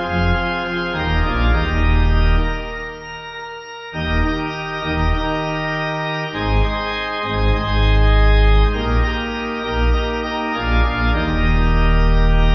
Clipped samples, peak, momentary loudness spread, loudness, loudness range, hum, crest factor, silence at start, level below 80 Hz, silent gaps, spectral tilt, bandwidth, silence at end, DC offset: under 0.1%; -2 dBFS; 9 LU; -19 LUFS; 4 LU; none; 14 dB; 0 s; -18 dBFS; none; -7 dB/octave; 6 kHz; 0 s; under 0.1%